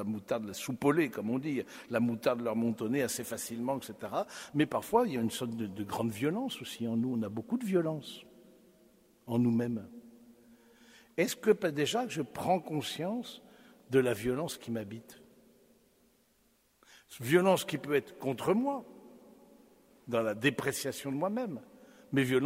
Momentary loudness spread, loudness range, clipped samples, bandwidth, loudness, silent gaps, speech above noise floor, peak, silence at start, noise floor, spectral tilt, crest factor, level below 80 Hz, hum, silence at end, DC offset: 11 LU; 4 LU; under 0.1%; 16 kHz; -33 LUFS; none; 38 dB; -12 dBFS; 0 s; -70 dBFS; -5 dB/octave; 22 dB; -70 dBFS; none; 0 s; under 0.1%